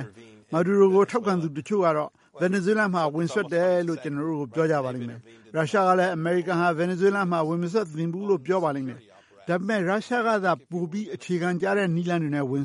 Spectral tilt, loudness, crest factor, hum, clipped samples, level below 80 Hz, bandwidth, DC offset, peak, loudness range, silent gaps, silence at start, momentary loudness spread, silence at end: -7 dB/octave; -25 LUFS; 18 dB; none; under 0.1%; -72 dBFS; 11.5 kHz; under 0.1%; -6 dBFS; 3 LU; none; 0 s; 9 LU; 0 s